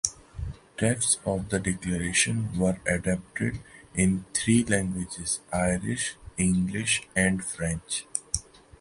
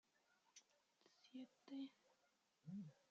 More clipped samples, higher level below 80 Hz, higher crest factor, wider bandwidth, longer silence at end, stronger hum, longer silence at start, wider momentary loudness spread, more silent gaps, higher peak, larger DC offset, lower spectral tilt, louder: neither; first, -46 dBFS vs under -90 dBFS; about the same, 22 dB vs 18 dB; first, 11.5 kHz vs 7.6 kHz; first, 0.4 s vs 0.15 s; neither; second, 0.05 s vs 0.55 s; second, 8 LU vs 12 LU; neither; first, -4 dBFS vs -44 dBFS; neither; second, -4 dB/octave vs -6.5 dB/octave; first, -27 LUFS vs -58 LUFS